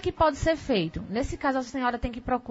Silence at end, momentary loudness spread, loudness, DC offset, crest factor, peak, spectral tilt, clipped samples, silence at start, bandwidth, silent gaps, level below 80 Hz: 0 s; 7 LU; -28 LUFS; under 0.1%; 16 dB; -10 dBFS; -5.5 dB/octave; under 0.1%; 0 s; 8 kHz; none; -40 dBFS